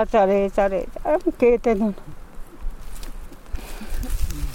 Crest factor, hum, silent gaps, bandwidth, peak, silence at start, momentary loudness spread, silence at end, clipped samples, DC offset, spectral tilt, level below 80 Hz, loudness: 16 dB; none; none; 16.5 kHz; -6 dBFS; 0 s; 22 LU; 0 s; under 0.1%; under 0.1%; -6.5 dB/octave; -30 dBFS; -21 LUFS